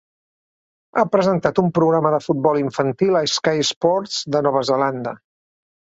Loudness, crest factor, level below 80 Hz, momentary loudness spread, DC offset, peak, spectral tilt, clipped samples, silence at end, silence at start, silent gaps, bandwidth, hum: -19 LUFS; 18 dB; -60 dBFS; 5 LU; under 0.1%; -2 dBFS; -5 dB/octave; under 0.1%; 0.7 s; 0.95 s; 3.76-3.81 s; 8 kHz; none